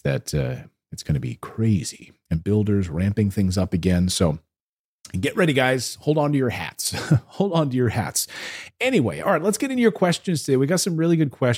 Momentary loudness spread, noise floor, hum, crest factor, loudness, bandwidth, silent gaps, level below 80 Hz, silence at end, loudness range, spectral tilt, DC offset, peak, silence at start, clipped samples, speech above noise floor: 9 LU; under -90 dBFS; none; 18 dB; -22 LUFS; 16.5 kHz; 4.61-5.00 s; -46 dBFS; 0 s; 2 LU; -5.5 dB/octave; under 0.1%; -4 dBFS; 0.05 s; under 0.1%; over 68 dB